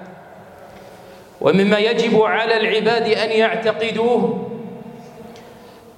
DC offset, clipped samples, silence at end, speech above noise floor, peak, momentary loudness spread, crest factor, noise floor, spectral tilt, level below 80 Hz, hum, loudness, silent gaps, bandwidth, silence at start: under 0.1%; under 0.1%; 0.25 s; 25 dB; -2 dBFS; 22 LU; 18 dB; -42 dBFS; -5.5 dB/octave; -64 dBFS; none; -17 LUFS; none; 10.5 kHz; 0 s